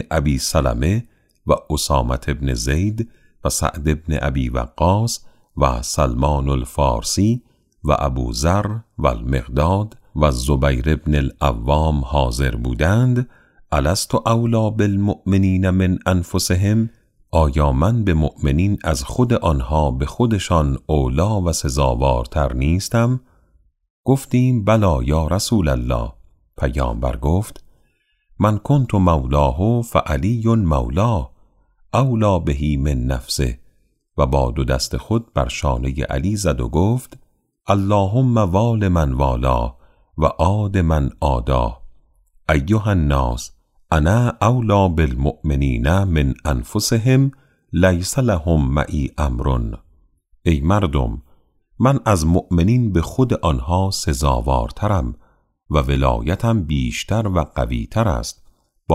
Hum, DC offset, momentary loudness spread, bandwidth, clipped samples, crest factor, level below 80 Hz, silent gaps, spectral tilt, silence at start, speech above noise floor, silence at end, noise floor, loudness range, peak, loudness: none; under 0.1%; 6 LU; 15.5 kHz; under 0.1%; 16 dB; -26 dBFS; 23.90-24.03 s; -6 dB/octave; 0 s; 45 dB; 0 s; -62 dBFS; 3 LU; -2 dBFS; -19 LUFS